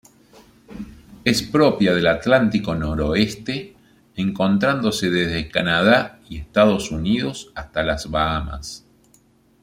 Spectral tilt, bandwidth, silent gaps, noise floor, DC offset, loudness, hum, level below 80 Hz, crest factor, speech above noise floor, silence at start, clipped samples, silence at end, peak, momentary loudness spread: -5.5 dB/octave; 16 kHz; none; -56 dBFS; under 0.1%; -20 LUFS; none; -40 dBFS; 20 dB; 37 dB; 0.7 s; under 0.1%; 0.85 s; -2 dBFS; 16 LU